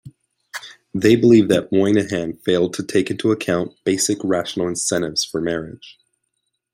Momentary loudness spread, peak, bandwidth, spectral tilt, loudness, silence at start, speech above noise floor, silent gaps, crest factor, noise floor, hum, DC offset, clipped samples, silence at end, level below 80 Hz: 15 LU; -2 dBFS; 16 kHz; -4.5 dB/octave; -19 LUFS; 0.05 s; 56 dB; none; 18 dB; -74 dBFS; none; under 0.1%; under 0.1%; 0.8 s; -56 dBFS